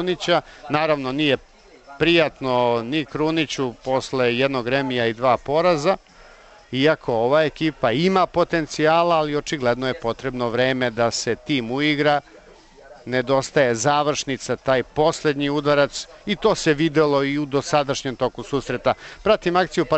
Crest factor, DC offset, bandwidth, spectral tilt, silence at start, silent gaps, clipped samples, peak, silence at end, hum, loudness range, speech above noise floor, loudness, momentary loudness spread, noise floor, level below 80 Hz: 16 dB; under 0.1%; 8.4 kHz; -4.5 dB/octave; 0 s; none; under 0.1%; -6 dBFS; 0 s; none; 2 LU; 27 dB; -21 LUFS; 7 LU; -47 dBFS; -50 dBFS